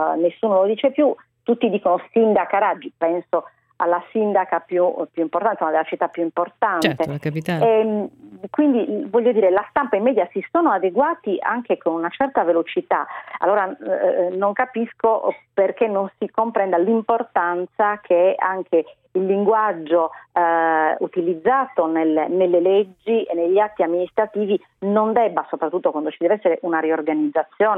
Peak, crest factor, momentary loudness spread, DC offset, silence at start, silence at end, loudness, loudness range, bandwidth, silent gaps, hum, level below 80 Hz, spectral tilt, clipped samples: -2 dBFS; 18 dB; 6 LU; under 0.1%; 0 s; 0 s; -20 LUFS; 2 LU; 13.5 kHz; none; none; -66 dBFS; -7.5 dB/octave; under 0.1%